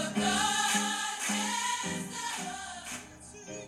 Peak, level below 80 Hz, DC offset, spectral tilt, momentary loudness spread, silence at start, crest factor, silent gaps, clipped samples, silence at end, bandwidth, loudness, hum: -16 dBFS; -64 dBFS; under 0.1%; -1.5 dB/octave; 15 LU; 0 s; 18 dB; none; under 0.1%; 0 s; 16 kHz; -31 LUFS; none